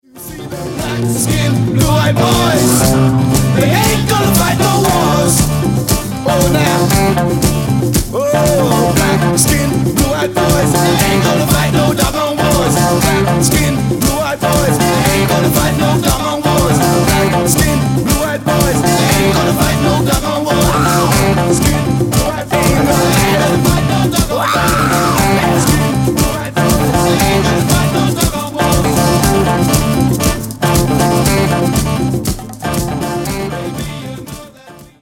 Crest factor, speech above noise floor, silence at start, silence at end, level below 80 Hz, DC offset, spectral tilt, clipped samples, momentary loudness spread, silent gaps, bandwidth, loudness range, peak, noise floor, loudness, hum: 12 dB; 26 dB; 0.15 s; 0.15 s; -26 dBFS; under 0.1%; -5 dB/octave; under 0.1%; 5 LU; none; 17 kHz; 1 LU; 0 dBFS; -37 dBFS; -12 LUFS; none